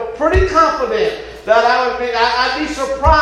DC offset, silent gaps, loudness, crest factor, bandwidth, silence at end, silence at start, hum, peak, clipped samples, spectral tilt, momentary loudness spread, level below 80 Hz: under 0.1%; none; -15 LUFS; 14 dB; 12 kHz; 0 s; 0 s; none; 0 dBFS; under 0.1%; -5 dB/octave; 7 LU; -26 dBFS